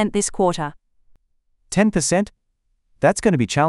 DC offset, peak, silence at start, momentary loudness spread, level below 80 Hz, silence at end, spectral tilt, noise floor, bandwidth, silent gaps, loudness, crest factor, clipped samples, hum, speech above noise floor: under 0.1%; -2 dBFS; 0 s; 10 LU; -44 dBFS; 0 s; -5 dB/octave; -68 dBFS; 12 kHz; none; -20 LUFS; 20 dB; under 0.1%; none; 50 dB